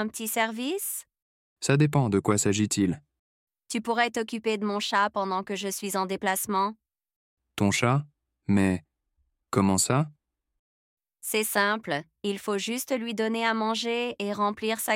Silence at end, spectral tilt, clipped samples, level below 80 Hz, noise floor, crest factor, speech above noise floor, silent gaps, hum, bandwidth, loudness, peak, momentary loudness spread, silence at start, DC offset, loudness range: 0 s; -4.5 dB/octave; under 0.1%; -66 dBFS; -75 dBFS; 20 dB; 48 dB; 1.22-1.56 s, 3.19-3.47 s, 7.16-7.37 s, 10.59-10.97 s; none; 16.5 kHz; -27 LUFS; -8 dBFS; 9 LU; 0 s; under 0.1%; 2 LU